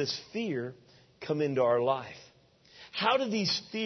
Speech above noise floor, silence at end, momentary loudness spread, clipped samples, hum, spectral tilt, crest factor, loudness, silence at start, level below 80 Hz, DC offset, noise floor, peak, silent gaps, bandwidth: 31 dB; 0 s; 16 LU; under 0.1%; none; -4.5 dB/octave; 20 dB; -30 LUFS; 0 s; -74 dBFS; under 0.1%; -61 dBFS; -12 dBFS; none; 6.4 kHz